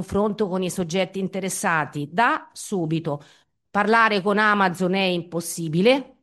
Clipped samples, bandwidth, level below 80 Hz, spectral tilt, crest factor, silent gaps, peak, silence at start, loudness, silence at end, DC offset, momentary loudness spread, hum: under 0.1%; 12.5 kHz; -56 dBFS; -4.5 dB/octave; 18 dB; none; -4 dBFS; 0 s; -22 LUFS; 0.2 s; under 0.1%; 10 LU; none